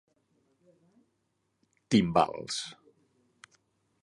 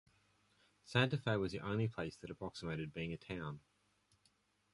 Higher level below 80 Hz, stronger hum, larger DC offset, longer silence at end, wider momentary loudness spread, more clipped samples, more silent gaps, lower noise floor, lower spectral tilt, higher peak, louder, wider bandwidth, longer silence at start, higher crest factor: about the same, -64 dBFS vs -66 dBFS; neither; neither; first, 1.3 s vs 1.15 s; about the same, 11 LU vs 12 LU; neither; neither; about the same, -78 dBFS vs -77 dBFS; second, -5 dB/octave vs -6.5 dB/octave; first, -8 dBFS vs -18 dBFS; first, -28 LUFS vs -41 LUFS; about the same, 11.5 kHz vs 11.5 kHz; first, 1.9 s vs 0.85 s; about the same, 26 dB vs 24 dB